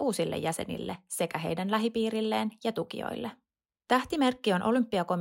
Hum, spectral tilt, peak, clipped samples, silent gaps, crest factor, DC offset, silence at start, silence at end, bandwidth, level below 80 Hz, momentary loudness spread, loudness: none; -5 dB/octave; -12 dBFS; under 0.1%; none; 18 dB; under 0.1%; 0 s; 0 s; 16.5 kHz; -64 dBFS; 9 LU; -30 LUFS